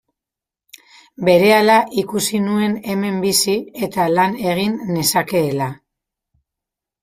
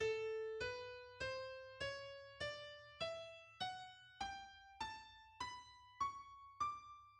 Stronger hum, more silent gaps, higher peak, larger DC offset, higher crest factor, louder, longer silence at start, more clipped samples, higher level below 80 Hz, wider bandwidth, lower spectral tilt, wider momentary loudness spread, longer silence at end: neither; neither; first, -2 dBFS vs -32 dBFS; neither; about the same, 18 dB vs 18 dB; first, -17 LUFS vs -48 LUFS; first, 1.2 s vs 0 s; neither; first, -58 dBFS vs -72 dBFS; first, 16 kHz vs 11 kHz; first, -4 dB/octave vs -2.5 dB/octave; about the same, 9 LU vs 11 LU; first, 1.3 s vs 0 s